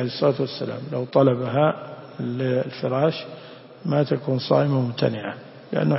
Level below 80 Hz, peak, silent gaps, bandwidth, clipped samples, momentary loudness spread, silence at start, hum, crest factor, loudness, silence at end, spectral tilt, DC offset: -64 dBFS; -4 dBFS; none; 5.8 kHz; under 0.1%; 14 LU; 0 s; none; 18 dB; -23 LUFS; 0 s; -10.5 dB/octave; under 0.1%